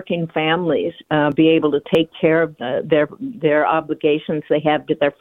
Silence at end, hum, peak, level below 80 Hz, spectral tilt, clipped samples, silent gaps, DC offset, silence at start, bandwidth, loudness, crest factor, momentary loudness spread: 0.1 s; none; -2 dBFS; -58 dBFS; -8 dB/octave; under 0.1%; none; under 0.1%; 0 s; 4.1 kHz; -18 LUFS; 16 dB; 7 LU